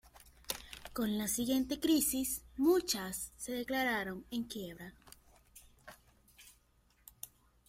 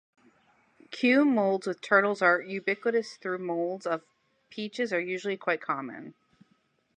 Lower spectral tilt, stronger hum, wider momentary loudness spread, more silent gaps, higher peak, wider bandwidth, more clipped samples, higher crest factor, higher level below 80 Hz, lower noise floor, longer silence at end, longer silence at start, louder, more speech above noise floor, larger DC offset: second, -3 dB/octave vs -5.5 dB/octave; neither; first, 20 LU vs 14 LU; neither; second, -14 dBFS vs -8 dBFS; first, 16.5 kHz vs 10 kHz; neither; about the same, 24 dB vs 22 dB; first, -62 dBFS vs -84 dBFS; about the same, -70 dBFS vs -70 dBFS; second, 0.4 s vs 0.85 s; second, 0.15 s vs 0.9 s; second, -35 LUFS vs -28 LUFS; second, 36 dB vs 42 dB; neither